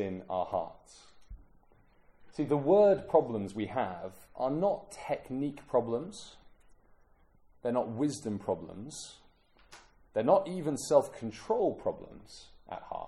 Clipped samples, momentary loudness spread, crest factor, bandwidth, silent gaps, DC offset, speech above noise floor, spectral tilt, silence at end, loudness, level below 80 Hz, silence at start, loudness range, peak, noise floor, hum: under 0.1%; 19 LU; 22 dB; 13.5 kHz; none; under 0.1%; 32 dB; -6 dB/octave; 0 s; -31 LUFS; -62 dBFS; 0 s; 8 LU; -10 dBFS; -63 dBFS; none